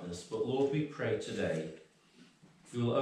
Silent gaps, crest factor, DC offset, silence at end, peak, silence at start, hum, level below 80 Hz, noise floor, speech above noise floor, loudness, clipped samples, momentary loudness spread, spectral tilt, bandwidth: none; 16 dB; under 0.1%; 0 s; -20 dBFS; 0 s; none; -72 dBFS; -62 dBFS; 28 dB; -36 LUFS; under 0.1%; 12 LU; -6.5 dB/octave; 11 kHz